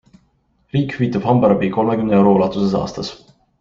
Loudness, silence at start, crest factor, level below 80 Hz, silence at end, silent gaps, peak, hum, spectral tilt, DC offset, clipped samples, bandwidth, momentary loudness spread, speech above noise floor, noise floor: -17 LUFS; 0.75 s; 16 dB; -48 dBFS; 0.45 s; none; -2 dBFS; none; -8 dB/octave; under 0.1%; under 0.1%; 7.2 kHz; 11 LU; 45 dB; -61 dBFS